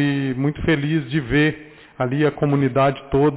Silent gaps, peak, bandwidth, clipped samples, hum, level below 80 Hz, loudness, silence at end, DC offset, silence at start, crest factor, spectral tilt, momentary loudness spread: none; -8 dBFS; 4 kHz; under 0.1%; none; -42 dBFS; -20 LUFS; 0 s; under 0.1%; 0 s; 12 dB; -11 dB/octave; 5 LU